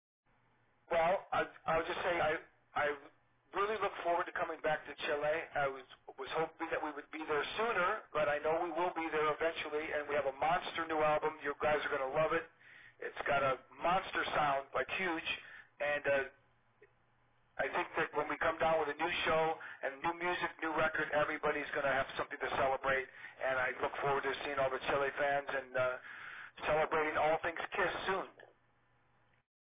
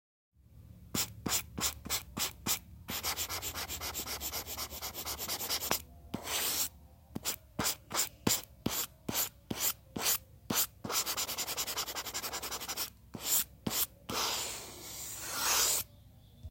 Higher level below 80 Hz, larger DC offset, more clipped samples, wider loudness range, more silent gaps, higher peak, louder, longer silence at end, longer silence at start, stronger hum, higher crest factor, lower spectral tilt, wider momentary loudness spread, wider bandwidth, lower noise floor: second, -66 dBFS vs -58 dBFS; neither; neither; about the same, 2 LU vs 3 LU; neither; second, -22 dBFS vs -10 dBFS; about the same, -36 LUFS vs -34 LUFS; first, 1.25 s vs 0 s; first, 0.9 s vs 0.5 s; neither; second, 14 dB vs 26 dB; about the same, -2 dB/octave vs -1 dB/octave; about the same, 8 LU vs 8 LU; second, 3.9 kHz vs 17 kHz; first, -74 dBFS vs -58 dBFS